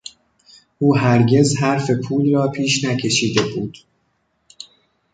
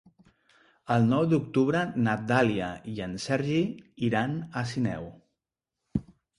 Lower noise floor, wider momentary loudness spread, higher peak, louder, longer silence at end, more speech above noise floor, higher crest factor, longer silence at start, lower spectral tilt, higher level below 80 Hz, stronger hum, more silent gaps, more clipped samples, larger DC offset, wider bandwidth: second, -67 dBFS vs -87 dBFS; first, 24 LU vs 11 LU; first, -2 dBFS vs -10 dBFS; first, -17 LUFS vs -28 LUFS; first, 0.5 s vs 0.35 s; second, 50 dB vs 60 dB; about the same, 18 dB vs 20 dB; about the same, 0.8 s vs 0.9 s; second, -5 dB/octave vs -7 dB/octave; about the same, -54 dBFS vs -56 dBFS; neither; neither; neither; neither; second, 9.4 kHz vs 11.5 kHz